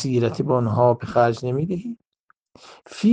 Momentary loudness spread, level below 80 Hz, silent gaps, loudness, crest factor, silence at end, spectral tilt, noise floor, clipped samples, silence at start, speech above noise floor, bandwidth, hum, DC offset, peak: 16 LU; -58 dBFS; 2.08-2.12 s, 2.20-2.28 s, 2.40-2.45 s; -21 LUFS; 18 dB; 0 s; -7.5 dB/octave; -65 dBFS; under 0.1%; 0 s; 45 dB; 9.2 kHz; none; under 0.1%; -4 dBFS